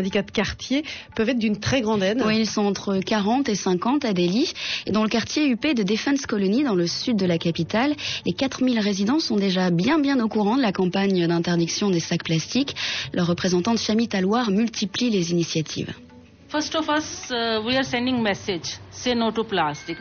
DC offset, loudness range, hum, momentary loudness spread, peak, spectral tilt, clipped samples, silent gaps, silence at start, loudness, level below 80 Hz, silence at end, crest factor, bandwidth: under 0.1%; 3 LU; none; 5 LU; -10 dBFS; -4 dB/octave; under 0.1%; none; 0 s; -23 LUFS; -54 dBFS; 0 s; 12 dB; 6.8 kHz